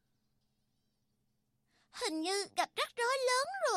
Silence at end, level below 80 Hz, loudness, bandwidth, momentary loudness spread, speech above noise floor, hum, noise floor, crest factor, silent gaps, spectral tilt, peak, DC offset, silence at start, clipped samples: 0 s; -82 dBFS; -34 LUFS; 15 kHz; 7 LU; 45 dB; none; -79 dBFS; 18 dB; none; 0 dB/octave; -20 dBFS; under 0.1%; 1.95 s; under 0.1%